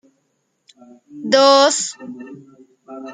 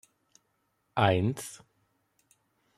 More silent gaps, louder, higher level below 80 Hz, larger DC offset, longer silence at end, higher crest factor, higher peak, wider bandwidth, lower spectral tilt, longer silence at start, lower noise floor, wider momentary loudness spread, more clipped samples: neither; first, -14 LUFS vs -29 LUFS; second, -74 dBFS vs -66 dBFS; neither; second, 0 s vs 1.2 s; second, 18 dB vs 26 dB; first, -2 dBFS vs -8 dBFS; second, 9.6 kHz vs 13.5 kHz; second, -1.5 dB/octave vs -5.5 dB/octave; first, 1.15 s vs 0.95 s; second, -68 dBFS vs -76 dBFS; first, 26 LU vs 19 LU; neither